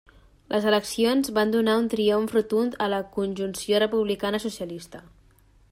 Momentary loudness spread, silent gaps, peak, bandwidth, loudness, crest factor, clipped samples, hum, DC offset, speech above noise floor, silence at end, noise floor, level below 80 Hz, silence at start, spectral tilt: 9 LU; none; -8 dBFS; 16 kHz; -24 LUFS; 16 dB; under 0.1%; none; under 0.1%; 33 dB; 0.7 s; -57 dBFS; -58 dBFS; 0.5 s; -4.5 dB/octave